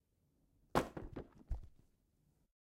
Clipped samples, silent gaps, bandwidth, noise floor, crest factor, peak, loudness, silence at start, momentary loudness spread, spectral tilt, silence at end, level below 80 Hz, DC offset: under 0.1%; none; 16 kHz; -78 dBFS; 28 dB; -18 dBFS; -44 LUFS; 0.75 s; 13 LU; -5.5 dB/octave; 0.95 s; -54 dBFS; under 0.1%